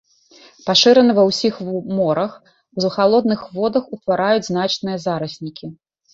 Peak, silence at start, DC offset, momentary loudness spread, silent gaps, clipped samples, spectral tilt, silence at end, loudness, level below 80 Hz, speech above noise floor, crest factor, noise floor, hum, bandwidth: 0 dBFS; 0.65 s; under 0.1%; 17 LU; none; under 0.1%; -5 dB/octave; 0.4 s; -17 LUFS; -60 dBFS; 31 dB; 18 dB; -49 dBFS; none; 8 kHz